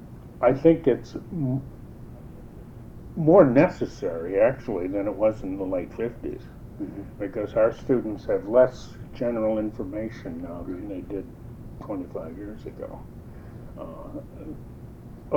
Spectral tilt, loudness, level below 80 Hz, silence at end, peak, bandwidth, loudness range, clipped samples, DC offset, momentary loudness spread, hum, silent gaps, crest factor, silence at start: -9 dB/octave; -25 LUFS; -46 dBFS; 0 s; -4 dBFS; 7.8 kHz; 15 LU; under 0.1%; under 0.1%; 24 LU; none; none; 22 dB; 0 s